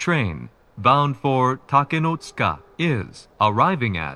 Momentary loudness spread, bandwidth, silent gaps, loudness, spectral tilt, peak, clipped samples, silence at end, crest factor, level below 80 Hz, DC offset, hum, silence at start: 10 LU; 10.5 kHz; none; -21 LUFS; -6.5 dB/octave; 0 dBFS; under 0.1%; 0 s; 20 dB; -50 dBFS; under 0.1%; none; 0 s